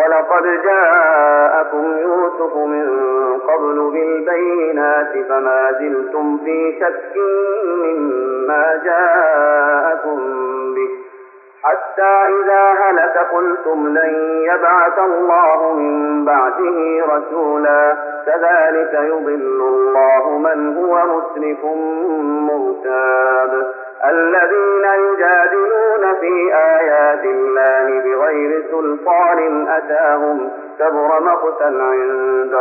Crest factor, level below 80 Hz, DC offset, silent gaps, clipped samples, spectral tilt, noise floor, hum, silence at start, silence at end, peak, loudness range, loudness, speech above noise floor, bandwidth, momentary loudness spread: 12 dB; -88 dBFS; under 0.1%; none; under 0.1%; -3.5 dB/octave; -40 dBFS; none; 0 s; 0 s; -2 dBFS; 3 LU; -14 LUFS; 26 dB; 2.9 kHz; 7 LU